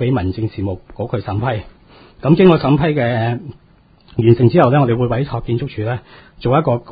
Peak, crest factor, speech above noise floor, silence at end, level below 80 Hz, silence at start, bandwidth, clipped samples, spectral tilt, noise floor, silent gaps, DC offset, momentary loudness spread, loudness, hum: 0 dBFS; 16 dB; 33 dB; 0 s; -38 dBFS; 0 s; 5 kHz; under 0.1%; -11 dB/octave; -49 dBFS; none; under 0.1%; 14 LU; -16 LUFS; none